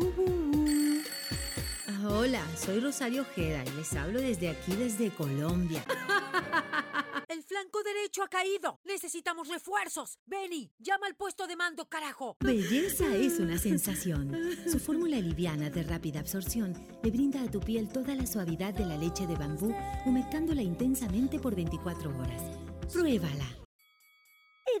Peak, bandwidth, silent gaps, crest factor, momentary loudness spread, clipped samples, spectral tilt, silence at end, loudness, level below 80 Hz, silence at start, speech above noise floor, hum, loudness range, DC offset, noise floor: -18 dBFS; 19 kHz; 8.76-8.84 s, 10.19-10.26 s, 10.71-10.78 s, 12.36-12.40 s, 23.65-23.79 s; 16 dB; 8 LU; under 0.1%; -5 dB/octave; 0 s; -33 LUFS; -48 dBFS; 0 s; 33 dB; none; 4 LU; under 0.1%; -65 dBFS